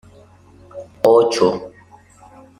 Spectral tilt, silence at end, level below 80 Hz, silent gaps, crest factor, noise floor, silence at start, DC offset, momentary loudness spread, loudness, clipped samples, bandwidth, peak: -5 dB/octave; 0.9 s; -58 dBFS; none; 18 dB; -47 dBFS; 0.75 s; under 0.1%; 25 LU; -16 LUFS; under 0.1%; 12 kHz; -2 dBFS